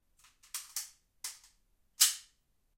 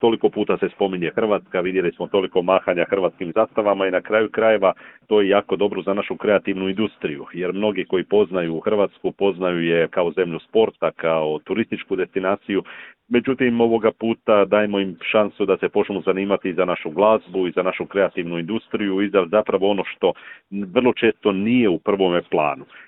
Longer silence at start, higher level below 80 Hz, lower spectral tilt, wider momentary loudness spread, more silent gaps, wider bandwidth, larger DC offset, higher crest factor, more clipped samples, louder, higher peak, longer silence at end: first, 0.55 s vs 0 s; second, -76 dBFS vs -60 dBFS; second, 6 dB/octave vs -10.5 dB/octave; first, 17 LU vs 6 LU; neither; first, 16.5 kHz vs 4 kHz; neither; first, 28 dB vs 18 dB; neither; second, -32 LUFS vs -20 LUFS; second, -10 dBFS vs -2 dBFS; first, 0.55 s vs 0.05 s